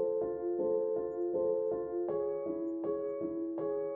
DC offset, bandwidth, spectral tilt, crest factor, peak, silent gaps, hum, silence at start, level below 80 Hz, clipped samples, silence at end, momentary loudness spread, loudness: under 0.1%; 2.4 kHz; -10 dB/octave; 12 dB; -22 dBFS; none; none; 0 s; -70 dBFS; under 0.1%; 0 s; 4 LU; -35 LUFS